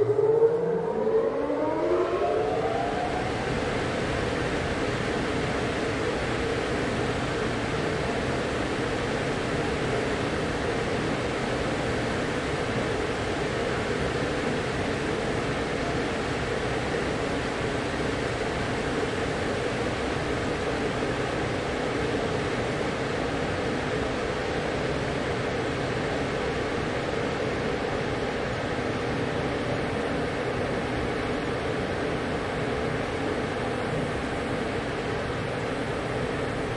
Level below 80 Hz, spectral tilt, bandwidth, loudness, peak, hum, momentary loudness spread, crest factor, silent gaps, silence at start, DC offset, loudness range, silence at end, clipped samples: -44 dBFS; -5.5 dB/octave; 11.5 kHz; -28 LUFS; -10 dBFS; none; 2 LU; 16 dB; none; 0 s; under 0.1%; 2 LU; 0 s; under 0.1%